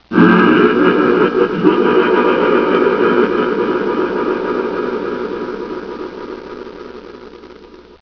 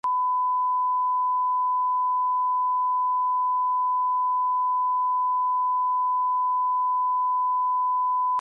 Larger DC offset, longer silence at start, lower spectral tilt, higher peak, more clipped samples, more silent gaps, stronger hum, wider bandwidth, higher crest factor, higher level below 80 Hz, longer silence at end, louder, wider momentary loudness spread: neither; about the same, 0.1 s vs 0.05 s; first, -8 dB/octave vs -2 dB/octave; first, 0 dBFS vs -20 dBFS; neither; neither; second, none vs 50 Hz at -105 dBFS; first, 5.4 kHz vs 1.6 kHz; first, 14 dB vs 4 dB; first, -48 dBFS vs -90 dBFS; first, 0.25 s vs 0 s; first, -14 LUFS vs -23 LUFS; first, 20 LU vs 0 LU